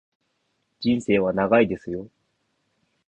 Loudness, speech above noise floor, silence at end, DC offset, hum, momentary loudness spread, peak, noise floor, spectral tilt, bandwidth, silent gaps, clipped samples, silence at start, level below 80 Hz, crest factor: -22 LUFS; 51 dB; 1 s; under 0.1%; none; 13 LU; -6 dBFS; -73 dBFS; -7 dB/octave; 8.8 kHz; none; under 0.1%; 0.8 s; -56 dBFS; 20 dB